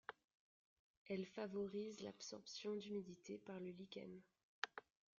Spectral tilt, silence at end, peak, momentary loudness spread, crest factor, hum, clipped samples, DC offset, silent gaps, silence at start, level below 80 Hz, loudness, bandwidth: -4 dB/octave; 0.4 s; -22 dBFS; 9 LU; 30 dB; none; under 0.1%; under 0.1%; 0.24-1.06 s, 4.43-4.62 s; 0.1 s; -88 dBFS; -51 LUFS; 7.4 kHz